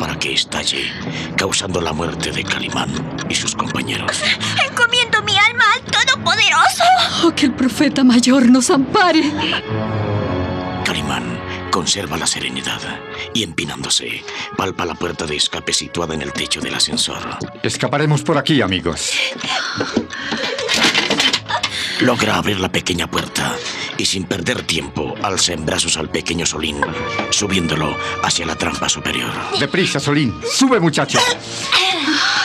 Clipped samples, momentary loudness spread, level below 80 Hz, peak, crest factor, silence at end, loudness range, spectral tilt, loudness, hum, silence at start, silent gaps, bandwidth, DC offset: under 0.1%; 9 LU; -46 dBFS; -2 dBFS; 14 dB; 0 s; 7 LU; -3 dB/octave; -16 LUFS; none; 0 s; none; 14.5 kHz; under 0.1%